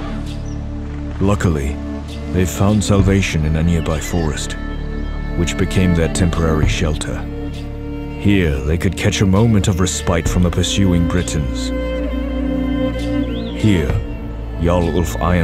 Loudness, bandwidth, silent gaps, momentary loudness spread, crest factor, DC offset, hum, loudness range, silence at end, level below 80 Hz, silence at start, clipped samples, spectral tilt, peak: -18 LUFS; 15.5 kHz; none; 12 LU; 16 dB; under 0.1%; none; 3 LU; 0 s; -24 dBFS; 0 s; under 0.1%; -6 dB/octave; 0 dBFS